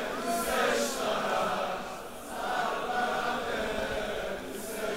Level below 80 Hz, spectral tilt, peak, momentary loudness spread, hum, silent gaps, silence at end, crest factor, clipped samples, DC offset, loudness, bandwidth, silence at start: -52 dBFS; -2.5 dB/octave; -16 dBFS; 9 LU; none; none; 0 s; 16 dB; under 0.1%; 0.3%; -31 LUFS; 16 kHz; 0 s